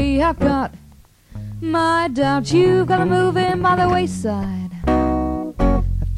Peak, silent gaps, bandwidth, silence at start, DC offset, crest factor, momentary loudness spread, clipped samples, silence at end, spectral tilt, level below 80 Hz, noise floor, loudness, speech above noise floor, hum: -4 dBFS; none; 12 kHz; 0 s; under 0.1%; 14 dB; 9 LU; under 0.1%; 0 s; -6.5 dB/octave; -28 dBFS; -47 dBFS; -18 LUFS; 30 dB; none